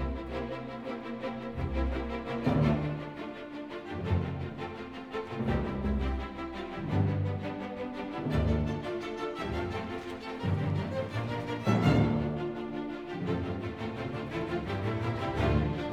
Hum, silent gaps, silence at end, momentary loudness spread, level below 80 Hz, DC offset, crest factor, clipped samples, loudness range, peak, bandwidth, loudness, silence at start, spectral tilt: none; none; 0 s; 10 LU; -42 dBFS; under 0.1%; 20 dB; under 0.1%; 4 LU; -12 dBFS; 10.5 kHz; -33 LUFS; 0 s; -8 dB/octave